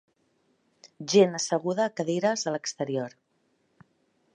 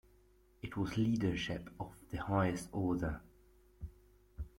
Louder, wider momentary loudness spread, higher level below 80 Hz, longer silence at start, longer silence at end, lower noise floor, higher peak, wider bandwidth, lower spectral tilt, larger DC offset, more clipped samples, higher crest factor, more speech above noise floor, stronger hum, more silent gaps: first, -26 LUFS vs -38 LUFS; second, 11 LU vs 18 LU; second, -80 dBFS vs -54 dBFS; first, 1 s vs 0.65 s; first, 1.25 s vs 0.1 s; first, -72 dBFS vs -67 dBFS; first, -8 dBFS vs -22 dBFS; second, 9.8 kHz vs 16.5 kHz; second, -4 dB/octave vs -6.5 dB/octave; neither; neither; about the same, 22 dB vs 18 dB; first, 46 dB vs 31 dB; neither; neither